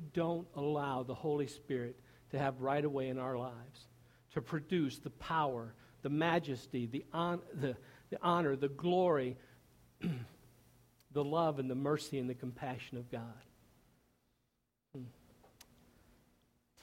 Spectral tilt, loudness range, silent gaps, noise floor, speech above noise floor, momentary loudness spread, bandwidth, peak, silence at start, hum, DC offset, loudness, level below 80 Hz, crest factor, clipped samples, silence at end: -7 dB/octave; 8 LU; none; -83 dBFS; 46 dB; 15 LU; 16.5 kHz; -18 dBFS; 0 s; none; under 0.1%; -38 LUFS; -70 dBFS; 20 dB; under 0.1%; 1.7 s